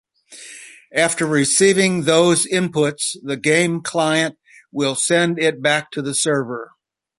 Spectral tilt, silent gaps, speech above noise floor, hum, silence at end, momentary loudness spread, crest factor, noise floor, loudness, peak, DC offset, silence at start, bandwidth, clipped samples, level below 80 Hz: -3.5 dB/octave; none; 23 dB; none; 0.55 s; 16 LU; 18 dB; -41 dBFS; -17 LUFS; 0 dBFS; under 0.1%; 0.3 s; 11.5 kHz; under 0.1%; -62 dBFS